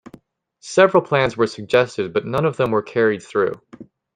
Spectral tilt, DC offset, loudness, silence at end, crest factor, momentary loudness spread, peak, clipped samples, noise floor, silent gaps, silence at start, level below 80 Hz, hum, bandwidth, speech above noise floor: -5.5 dB/octave; under 0.1%; -19 LUFS; 0.35 s; 18 dB; 8 LU; -2 dBFS; under 0.1%; -54 dBFS; none; 0.65 s; -56 dBFS; none; 10 kHz; 36 dB